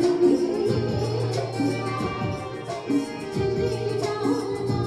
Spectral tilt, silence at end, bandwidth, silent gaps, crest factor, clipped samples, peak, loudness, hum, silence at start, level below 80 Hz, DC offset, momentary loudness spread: -7 dB/octave; 0 s; 12.5 kHz; none; 16 dB; under 0.1%; -8 dBFS; -25 LUFS; none; 0 s; -50 dBFS; under 0.1%; 8 LU